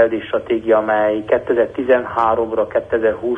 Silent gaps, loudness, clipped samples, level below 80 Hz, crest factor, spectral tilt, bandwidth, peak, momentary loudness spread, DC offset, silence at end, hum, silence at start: none; -17 LUFS; under 0.1%; -48 dBFS; 14 dB; -7.5 dB/octave; 5 kHz; -2 dBFS; 4 LU; under 0.1%; 0 s; none; 0 s